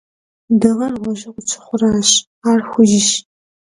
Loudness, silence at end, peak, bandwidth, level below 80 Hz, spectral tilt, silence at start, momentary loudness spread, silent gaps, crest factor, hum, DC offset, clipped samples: -15 LUFS; 0.5 s; 0 dBFS; 11.5 kHz; -52 dBFS; -3.5 dB/octave; 0.5 s; 12 LU; 2.27-2.42 s; 16 dB; none; under 0.1%; under 0.1%